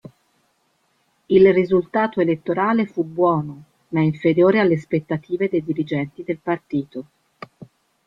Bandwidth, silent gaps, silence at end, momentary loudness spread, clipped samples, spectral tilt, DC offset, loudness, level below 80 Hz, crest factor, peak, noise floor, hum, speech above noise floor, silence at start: 5.4 kHz; none; 0.45 s; 13 LU; under 0.1%; -9 dB/octave; under 0.1%; -20 LUFS; -60 dBFS; 18 dB; -2 dBFS; -66 dBFS; none; 47 dB; 1.3 s